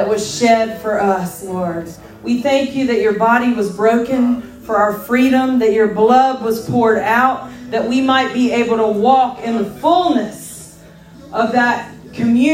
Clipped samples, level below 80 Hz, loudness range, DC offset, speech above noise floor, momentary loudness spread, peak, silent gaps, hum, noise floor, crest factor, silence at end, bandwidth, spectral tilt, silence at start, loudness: under 0.1%; -50 dBFS; 3 LU; under 0.1%; 25 dB; 10 LU; 0 dBFS; none; none; -40 dBFS; 14 dB; 0 s; 16.5 kHz; -5 dB/octave; 0 s; -15 LUFS